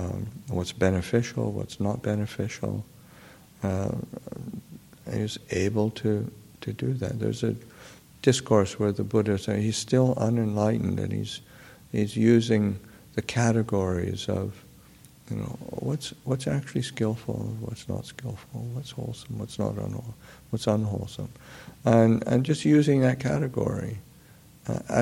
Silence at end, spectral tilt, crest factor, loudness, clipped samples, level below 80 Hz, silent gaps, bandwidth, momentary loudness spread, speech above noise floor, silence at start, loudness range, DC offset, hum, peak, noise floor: 0 s; -6.5 dB/octave; 22 dB; -27 LUFS; under 0.1%; -54 dBFS; none; 16.5 kHz; 16 LU; 26 dB; 0 s; 8 LU; under 0.1%; none; -6 dBFS; -53 dBFS